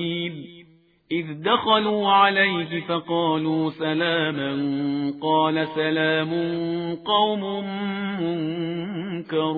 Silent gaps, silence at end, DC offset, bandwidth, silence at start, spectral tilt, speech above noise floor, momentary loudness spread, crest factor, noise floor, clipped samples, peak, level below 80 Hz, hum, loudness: none; 0 s; under 0.1%; 4.7 kHz; 0 s; -8.5 dB/octave; 32 dB; 10 LU; 18 dB; -55 dBFS; under 0.1%; -4 dBFS; -66 dBFS; none; -23 LUFS